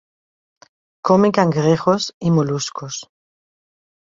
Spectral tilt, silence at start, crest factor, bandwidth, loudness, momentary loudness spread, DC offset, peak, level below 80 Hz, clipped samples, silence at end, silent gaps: -6 dB/octave; 1.05 s; 18 dB; 7.8 kHz; -18 LUFS; 14 LU; under 0.1%; -2 dBFS; -58 dBFS; under 0.1%; 1.1 s; 2.14-2.21 s